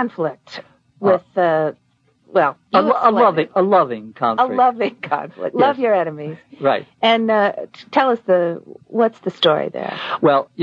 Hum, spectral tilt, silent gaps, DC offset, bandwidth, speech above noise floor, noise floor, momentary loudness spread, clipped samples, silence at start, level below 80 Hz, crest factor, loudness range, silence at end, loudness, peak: none; -7 dB/octave; none; under 0.1%; 7.4 kHz; 36 dB; -54 dBFS; 10 LU; under 0.1%; 0 s; -72 dBFS; 16 dB; 2 LU; 0 s; -18 LUFS; 0 dBFS